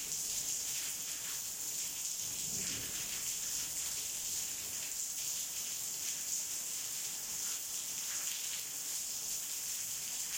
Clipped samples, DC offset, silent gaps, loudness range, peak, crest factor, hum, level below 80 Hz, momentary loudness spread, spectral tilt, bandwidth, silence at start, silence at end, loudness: under 0.1%; under 0.1%; none; 1 LU; -20 dBFS; 20 dB; none; -70 dBFS; 2 LU; 1 dB/octave; 16.5 kHz; 0 s; 0 s; -36 LUFS